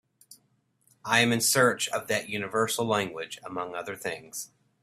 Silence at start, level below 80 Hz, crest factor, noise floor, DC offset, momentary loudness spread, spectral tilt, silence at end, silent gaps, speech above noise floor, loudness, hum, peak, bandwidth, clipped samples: 0.3 s; -70 dBFS; 22 dB; -70 dBFS; under 0.1%; 16 LU; -3 dB/octave; 0.35 s; none; 42 dB; -27 LUFS; none; -6 dBFS; 16 kHz; under 0.1%